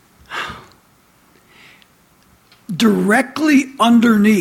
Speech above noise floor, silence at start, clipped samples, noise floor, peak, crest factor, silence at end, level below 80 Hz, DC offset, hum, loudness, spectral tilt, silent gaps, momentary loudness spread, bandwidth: 40 dB; 0.3 s; under 0.1%; -53 dBFS; -2 dBFS; 16 dB; 0 s; -56 dBFS; under 0.1%; none; -14 LUFS; -5 dB/octave; none; 18 LU; 16 kHz